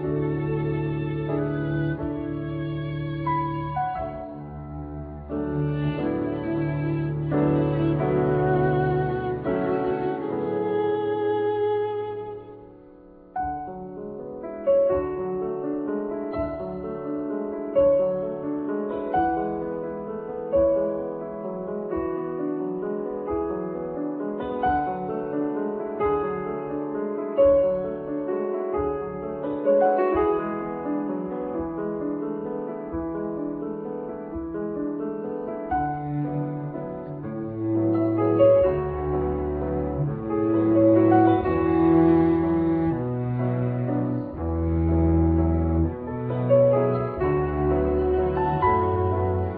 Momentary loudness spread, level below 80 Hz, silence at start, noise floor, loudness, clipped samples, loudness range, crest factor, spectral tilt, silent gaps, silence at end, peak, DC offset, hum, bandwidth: 12 LU; -40 dBFS; 0 s; -48 dBFS; -25 LUFS; under 0.1%; 8 LU; 18 dB; -12.5 dB/octave; none; 0 s; -6 dBFS; under 0.1%; none; 4.5 kHz